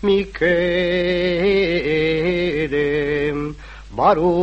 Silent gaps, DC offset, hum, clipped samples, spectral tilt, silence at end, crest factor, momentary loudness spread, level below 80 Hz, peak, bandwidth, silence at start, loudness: none; under 0.1%; none; under 0.1%; -7 dB/octave; 0 s; 16 dB; 6 LU; -38 dBFS; -2 dBFS; 8.2 kHz; 0 s; -19 LUFS